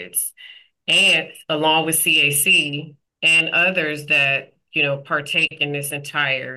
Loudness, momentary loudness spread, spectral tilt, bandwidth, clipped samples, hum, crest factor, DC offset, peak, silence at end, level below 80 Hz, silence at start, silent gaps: -17 LUFS; 11 LU; -1.5 dB/octave; 13 kHz; under 0.1%; none; 12 dB; under 0.1%; -8 dBFS; 0 s; -72 dBFS; 0 s; none